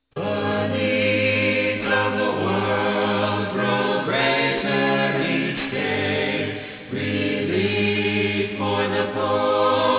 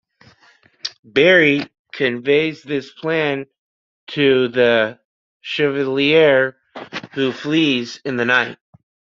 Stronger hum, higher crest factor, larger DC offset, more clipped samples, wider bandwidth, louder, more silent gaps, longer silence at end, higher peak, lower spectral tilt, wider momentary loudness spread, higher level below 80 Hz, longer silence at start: neither; about the same, 14 dB vs 18 dB; neither; neither; second, 4 kHz vs 7.4 kHz; second, -21 LUFS vs -17 LUFS; second, none vs 0.99-1.03 s, 1.79-1.85 s, 3.59-4.07 s, 5.05-5.40 s; second, 0 s vs 0.65 s; second, -8 dBFS vs -2 dBFS; first, -9.5 dB/octave vs -5.5 dB/octave; second, 5 LU vs 17 LU; first, -52 dBFS vs -62 dBFS; second, 0.15 s vs 0.85 s